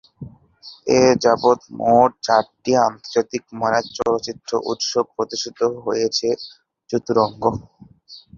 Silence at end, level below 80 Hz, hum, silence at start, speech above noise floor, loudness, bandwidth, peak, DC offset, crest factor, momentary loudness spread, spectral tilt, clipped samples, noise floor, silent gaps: 0.2 s; -54 dBFS; none; 0.2 s; 20 dB; -19 LUFS; 7.4 kHz; -2 dBFS; under 0.1%; 18 dB; 12 LU; -4 dB/octave; under 0.1%; -39 dBFS; none